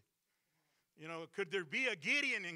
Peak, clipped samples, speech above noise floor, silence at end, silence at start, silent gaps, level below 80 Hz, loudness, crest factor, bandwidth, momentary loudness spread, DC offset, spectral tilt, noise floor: -22 dBFS; under 0.1%; 46 dB; 0 s; 1 s; none; -90 dBFS; -36 LUFS; 18 dB; 15.5 kHz; 15 LU; under 0.1%; -3 dB/octave; -85 dBFS